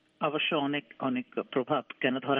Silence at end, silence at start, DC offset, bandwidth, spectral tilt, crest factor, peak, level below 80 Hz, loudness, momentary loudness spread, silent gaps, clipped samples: 0 s; 0.2 s; under 0.1%; 3.8 kHz; -8.5 dB/octave; 20 dB; -12 dBFS; -80 dBFS; -31 LUFS; 5 LU; none; under 0.1%